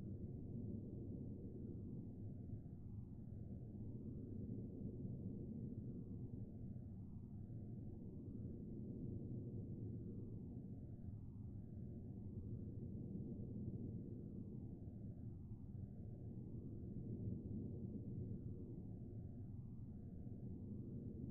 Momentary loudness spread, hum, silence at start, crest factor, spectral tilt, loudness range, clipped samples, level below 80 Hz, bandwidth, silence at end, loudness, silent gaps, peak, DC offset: 4 LU; none; 0 s; 16 dB; -15.5 dB/octave; 2 LU; under 0.1%; -62 dBFS; 1.6 kHz; 0 s; -52 LUFS; none; -34 dBFS; under 0.1%